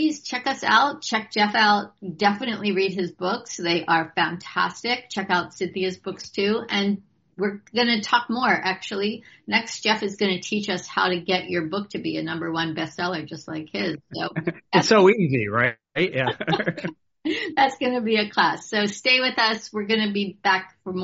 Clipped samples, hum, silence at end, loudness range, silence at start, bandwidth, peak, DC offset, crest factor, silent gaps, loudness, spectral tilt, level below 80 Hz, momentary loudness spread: under 0.1%; none; 0 s; 4 LU; 0 s; 8 kHz; -2 dBFS; under 0.1%; 20 dB; none; -23 LUFS; -2.5 dB/octave; -66 dBFS; 10 LU